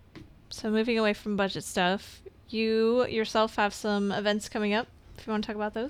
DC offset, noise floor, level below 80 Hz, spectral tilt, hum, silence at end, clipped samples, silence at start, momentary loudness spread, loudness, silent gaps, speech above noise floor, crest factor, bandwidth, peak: under 0.1%; -51 dBFS; -56 dBFS; -4.5 dB/octave; none; 0 s; under 0.1%; 0.15 s; 11 LU; -28 LUFS; none; 23 dB; 16 dB; 15 kHz; -12 dBFS